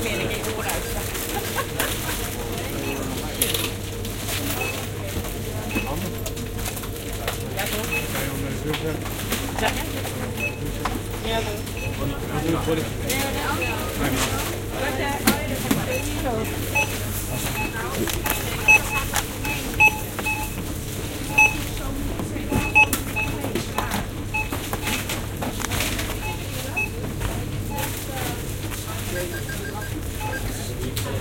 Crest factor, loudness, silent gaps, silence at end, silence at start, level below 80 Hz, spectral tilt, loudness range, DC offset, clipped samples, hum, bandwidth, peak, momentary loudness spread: 22 dB; -24 LUFS; none; 0 s; 0 s; -36 dBFS; -3.5 dB/octave; 7 LU; under 0.1%; under 0.1%; none; 17 kHz; -2 dBFS; 10 LU